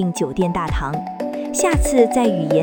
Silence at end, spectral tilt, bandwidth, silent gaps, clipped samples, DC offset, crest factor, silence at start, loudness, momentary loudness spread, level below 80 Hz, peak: 0 s; -5.5 dB/octave; 19 kHz; none; under 0.1%; under 0.1%; 16 dB; 0 s; -19 LUFS; 10 LU; -28 dBFS; -2 dBFS